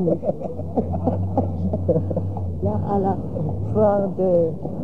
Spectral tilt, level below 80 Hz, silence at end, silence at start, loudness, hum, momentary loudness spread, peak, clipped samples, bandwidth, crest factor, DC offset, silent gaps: -12 dB/octave; -42 dBFS; 0 s; 0 s; -23 LUFS; none; 7 LU; -6 dBFS; under 0.1%; 3 kHz; 16 dB; 2%; none